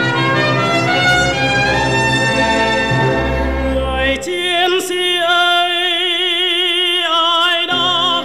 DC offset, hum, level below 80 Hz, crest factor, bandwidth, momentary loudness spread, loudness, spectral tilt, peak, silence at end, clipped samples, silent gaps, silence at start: 0.7%; none; -30 dBFS; 12 dB; 15.5 kHz; 5 LU; -13 LUFS; -4 dB/octave; -2 dBFS; 0 s; under 0.1%; none; 0 s